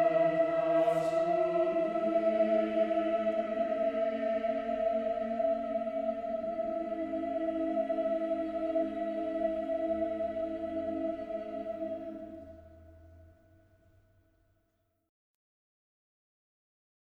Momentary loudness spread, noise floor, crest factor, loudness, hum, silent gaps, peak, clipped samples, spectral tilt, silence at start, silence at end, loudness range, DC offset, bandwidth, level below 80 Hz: 10 LU; -77 dBFS; 16 dB; -32 LUFS; none; none; -18 dBFS; under 0.1%; -7 dB/octave; 0 s; 3.75 s; 11 LU; under 0.1%; 8.2 kHz; -64 dBFS